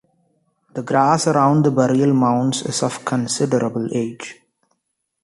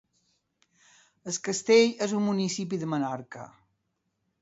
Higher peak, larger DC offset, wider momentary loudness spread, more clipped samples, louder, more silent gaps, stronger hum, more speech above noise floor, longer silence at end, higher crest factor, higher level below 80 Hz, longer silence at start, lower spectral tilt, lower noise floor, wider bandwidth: first, -2 dBFS vs -8 dBFS; neither; second, 13 LU vs 23 LU; neither; first, -18 LUFS vs -27 LUFS; neither; neither; first, 57 dB vs 52 dB; about the same, 0.9 s vs 0.95 s; second, 16 dB vs 22 dB; first, -60 dBFS vs -74 dBFS; second, 0.75 s vs 1.25 s; about the same, -5.5 dB/octave vs -4.5 dB/octave; second, -74 dBFS vs -78 dBFS; first, 11.5 kHz vs 8 kHz